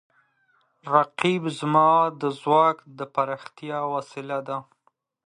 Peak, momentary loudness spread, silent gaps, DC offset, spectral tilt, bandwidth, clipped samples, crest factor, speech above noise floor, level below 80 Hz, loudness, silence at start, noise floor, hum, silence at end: -4 dBFS; 15 LU; none; under 0.1%; -6 dB/octave; 11.5 kHz; under 0.1%; 22 dB; 46 dB; -74 dBFS; -24 LUFS; 0.85 s; -69 dBFS; none; 0.65 s